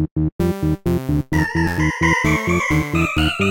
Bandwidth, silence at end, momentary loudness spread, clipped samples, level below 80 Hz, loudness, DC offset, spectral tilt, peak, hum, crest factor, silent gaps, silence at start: 17 kHz; 0 s; 4 LU; under 0.1%; -30 dBFS; -19 LUFS; under 0.1%; -6 dB/octave; -2 dBFS; none; 16 dB; 0.11-0.16 s, 0.32-0.39 s; 0 s